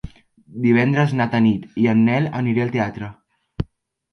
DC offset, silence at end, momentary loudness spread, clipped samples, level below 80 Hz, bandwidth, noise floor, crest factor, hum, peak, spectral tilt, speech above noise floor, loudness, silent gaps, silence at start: under 0.1%; 0.5 s; 17 LU; under 0.1%; -46 dBFS; 6.4 kHz; -47 dBFS; 16 dB; none; -4 dBFS; -8.5 dB/octave; 29 dB; -19 LUFS; none; 0.05 s